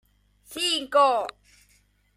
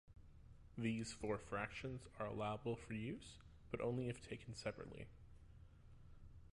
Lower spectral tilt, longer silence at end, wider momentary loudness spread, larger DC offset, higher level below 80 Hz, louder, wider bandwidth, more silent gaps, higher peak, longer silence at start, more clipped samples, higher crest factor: second, -0.5 dB/octave vs -6 dB/octave; first, 0.85 s vs 0.05 s; second, 16 LU vs 22 LU; neither; about the same, -64 dBFS vs -64 dBFS; first, -23 LUFS vs -47 LUFS; first, 16 kHz vs 11.5 kHz; neither; first, -8 dBFS vs -30 dBFS; first, 0.5 s vs 0.05 s; neither; about the same, 18 dB vs 18 dB